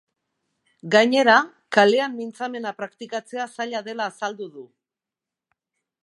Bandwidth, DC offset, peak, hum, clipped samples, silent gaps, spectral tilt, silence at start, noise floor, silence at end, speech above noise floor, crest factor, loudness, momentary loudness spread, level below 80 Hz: 11.5 kHz; under 0.1%; 0 dBFS; none; under 0.1%; none; -4 dB/octave; 0.85 s; -89 dBFS; 1.35 s; 67 dB; 22 dB; -21 LUFS; 17 LU; -80 dBFS